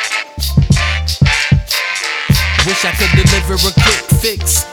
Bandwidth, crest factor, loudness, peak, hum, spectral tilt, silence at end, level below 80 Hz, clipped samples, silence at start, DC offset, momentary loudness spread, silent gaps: over 20 kHz; 12 dB; -12 LUFS; 0 dBFS; none; -3.5 dB/octave; 0 s; -20 dBFS; under 0.1%; 0 s; under 0.1%; 5 LU; none